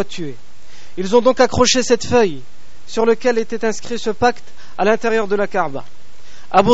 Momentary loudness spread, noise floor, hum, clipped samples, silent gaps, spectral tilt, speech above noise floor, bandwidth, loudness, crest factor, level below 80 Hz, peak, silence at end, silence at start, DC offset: 17 LU; -46 dBFS; none; under 0.1%; none; -3 dB/octave; 28 dB; 8 kHz; -17 LUFS; 18 dB; -44 dBFS; 0 dBFS; 0 s; 0 s; 8%